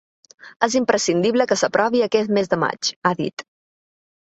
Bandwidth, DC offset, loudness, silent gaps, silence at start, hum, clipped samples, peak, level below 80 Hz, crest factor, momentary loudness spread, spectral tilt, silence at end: 8.2 kHz; under 0.1%; -20 LUFS; 0.56-0.60 s, 2.96-3.02 s, 3.33-3.37 s; 0.45 s; none; under 0.1%; -2 dBFS; -62 dBFS; 18 dB; 5 LU; -4 dB/octave; 0.8 s